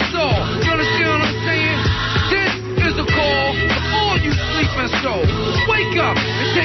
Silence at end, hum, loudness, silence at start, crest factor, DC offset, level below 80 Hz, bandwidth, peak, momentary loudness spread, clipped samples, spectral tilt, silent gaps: 0 s; none; -17 LUFS; 0 s; 12 dB; under 0.1%; -30 dBFS; 6.2 kHz; -4 dBFS; 3 LU; under 0.1%; -5.5 dB/octave; none